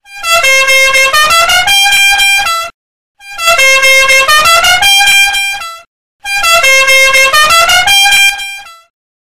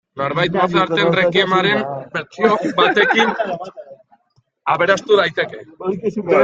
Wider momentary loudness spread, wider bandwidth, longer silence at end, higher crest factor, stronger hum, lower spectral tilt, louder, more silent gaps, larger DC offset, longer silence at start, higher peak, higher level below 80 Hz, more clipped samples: about the same, 12 LU vs 12 LU; first, 16.5 kHz vs 7.8 kHz; first, 0.45 s vs 0 s; second, 8 dB vs 16 dB; neither; second, 2 dB/octave vs -5 dB/octave; first, -5 LUFS vs -17 LUFS; first, 2.74-3.15 s, 5.87-6.19 s vs none; first, 3% vs under 0.1%; second, 0 s vs 0.15 s; about the same, 0 dBFS vs -2 dBFS; first, -36 dBFS vs -58 dBFS; neither